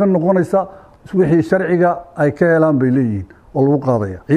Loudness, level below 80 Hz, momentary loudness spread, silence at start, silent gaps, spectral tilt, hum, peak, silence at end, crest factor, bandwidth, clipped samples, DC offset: -15 LUFS; -48 dBFS; 8 LU; 0 s; none; -9.5 dB/octave; none; -2 dBFS; 0 s; 14 dB; 11.5 kHz; under 0.1%; under 0.1%